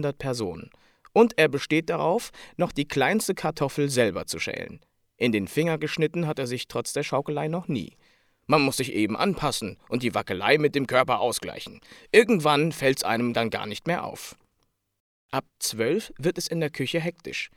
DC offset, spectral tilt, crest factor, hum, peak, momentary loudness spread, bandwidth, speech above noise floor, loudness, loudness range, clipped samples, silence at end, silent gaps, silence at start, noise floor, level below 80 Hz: under 0.1%; -4.5 dB/octave; 22 dB; none; -4 dBFS; 11 LU; 17.5 kHz; 48 dB; -25 LUFS; 6 LU; under 0.1%; 0.1 s; 15.00-15.29 s; 0 s; -73 dBFS; -58 dBFS